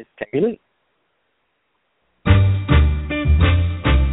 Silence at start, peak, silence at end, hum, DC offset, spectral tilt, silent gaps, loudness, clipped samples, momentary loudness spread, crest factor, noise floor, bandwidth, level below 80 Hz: 0 s; 0 dBFS; 0 s; none; under 0.1%; -6.5 dB/octave; none; -18 LUFS; under 0.1%; 9 LU; 18 dB; -69 dBFS; 4 kHz; -22 dBFS